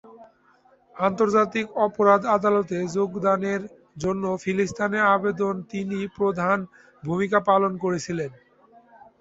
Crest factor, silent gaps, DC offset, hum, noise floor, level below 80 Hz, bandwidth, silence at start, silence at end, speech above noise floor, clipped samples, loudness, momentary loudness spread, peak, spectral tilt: 20 dB; none; under 0.1%; none; -59 dBFS; -62 dBFS; 8 kHz; 0.05 s; 0.9 s; 36 dB; under 0.1%; -23 LUFS; 11 LU; -4 dBFS; -6 dB/octave